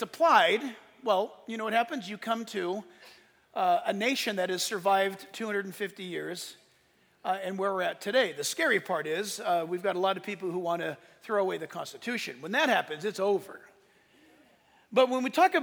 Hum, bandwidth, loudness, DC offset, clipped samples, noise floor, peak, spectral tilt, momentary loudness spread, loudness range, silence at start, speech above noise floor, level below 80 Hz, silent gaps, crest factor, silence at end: none; over 20 kHz; -29 LUFS; under 0.1%; under 0.1%; -66 dBFS; -8 dBFS; -3 dB/octave; 12 LU; 3 LU; 0 s; 37 dB; -82 dBFS; none; 22 dB; 0 s